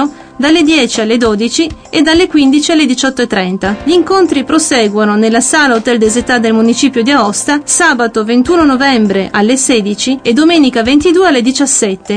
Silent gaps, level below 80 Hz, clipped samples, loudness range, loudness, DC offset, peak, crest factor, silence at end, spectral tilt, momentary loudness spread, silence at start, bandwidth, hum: none; -38 dBFS; under 0.1%; 1 LU; -9 LUFS; under 0.1%; 0 dBFS; 10 dB; 0 s; -3 dB/octave; 5 LU; 0 s; 10.5 kHz; none